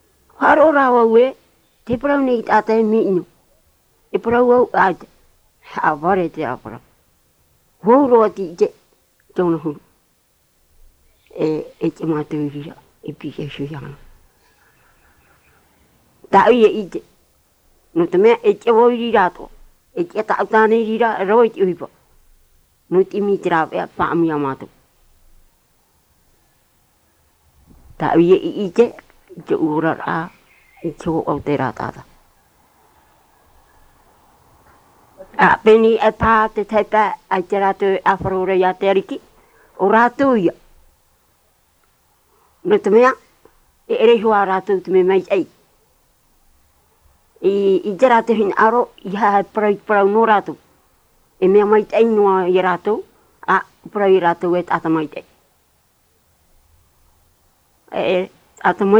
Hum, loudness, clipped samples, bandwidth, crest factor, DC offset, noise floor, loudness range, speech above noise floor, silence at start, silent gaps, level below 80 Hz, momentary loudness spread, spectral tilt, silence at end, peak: none; -16 LUFS; under 0.1%; 9 kHz; 16 dB; under 0.1%; -61 dBFS; 10 LU; 45 dB; 0.4 s; none; -50 dBFS; 16 LU; -7 dB/octave; 0 s; -2 dBFS